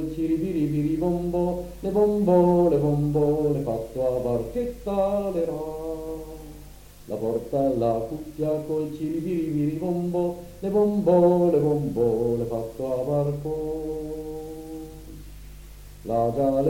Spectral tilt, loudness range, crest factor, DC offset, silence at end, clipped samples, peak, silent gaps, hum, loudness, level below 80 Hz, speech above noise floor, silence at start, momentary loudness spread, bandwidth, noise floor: -9 dB/octave; 7 LU; 18 dB; under 0.1%; 0 s; under 0.1%; -8 dBFS; none; 50 Hz at -45 dBFS; -25 LUFS; -44 dBFS; 21 dB; 0 s; 16 LU; 17 kHz; -45 dBFS